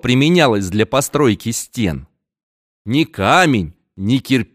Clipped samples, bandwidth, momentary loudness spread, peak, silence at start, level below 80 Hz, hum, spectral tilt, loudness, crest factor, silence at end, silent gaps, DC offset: under 0.1%; 15.5 kHz; 11 LU; 0 dBFS; 0.05 s; -44 dBFS; none; -5 dB/octave; -16 LUFS; 16 dB; 0.1 s; 2.43-2.85 s; under 0.1%